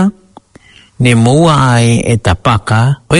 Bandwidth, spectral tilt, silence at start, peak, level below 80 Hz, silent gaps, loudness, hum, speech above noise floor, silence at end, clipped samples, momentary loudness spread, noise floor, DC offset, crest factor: 11 kHz; -6 dB/octave; 0 s; 0 dBFS; -34 dBFS; none; -10 LUFS; none; 33 dB; 0 s; 0.3%; 5 LU; -42 dBFS; under 0.1%; 10 dB